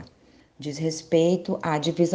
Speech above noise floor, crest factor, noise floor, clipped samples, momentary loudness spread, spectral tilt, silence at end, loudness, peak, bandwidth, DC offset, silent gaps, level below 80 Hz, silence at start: 33 dB; 16 dB; -57 dBFS; under 0.1%; 12 LU; -6 dB/octave; 0 s; -25 LUFS; -8 dBFS; 9.8 kHz; under 0.1%; none; -64 dBFS; 0 s